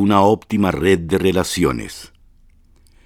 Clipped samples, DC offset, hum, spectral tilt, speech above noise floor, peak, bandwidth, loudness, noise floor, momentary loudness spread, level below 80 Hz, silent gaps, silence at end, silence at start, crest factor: under 0.1%; under 0.1%; none; -5.5 dB/octave; 34 dB; 0 dBFS; 17 kHz; -17 LUFS; -50 dBFS; 13 LU; -40 dBFS; none; 1 s; 0 s; 18 dB